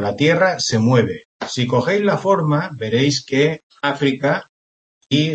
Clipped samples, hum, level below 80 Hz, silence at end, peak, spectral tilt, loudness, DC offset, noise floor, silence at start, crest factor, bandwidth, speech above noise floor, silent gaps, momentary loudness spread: under 0.1%; none; -58 dBFS; 0 s; -2 dBFS; -5.5 dB/octave; -18 LUFS; under 0.1%; under -90 dBFS; 0 s; 16 dB; 8.8 kHz; over 73 dB; 1.25-1.40 s, 3.63-3.70 s, 4.49-5.01 s; 8 LU